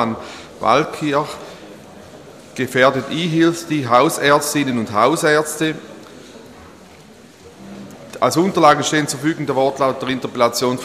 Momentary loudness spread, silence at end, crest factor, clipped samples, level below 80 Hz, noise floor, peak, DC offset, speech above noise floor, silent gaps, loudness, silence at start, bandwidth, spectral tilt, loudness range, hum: 22 LU; 0 s; 18 dB; under 0.1%; -58 dBFS; -43 dBFS; 0 dBFS; under 0.1%; 26 dB; none; -17 LUFS; 0 s; 15 kHz; -4.5 dB/octave; 5 LU; none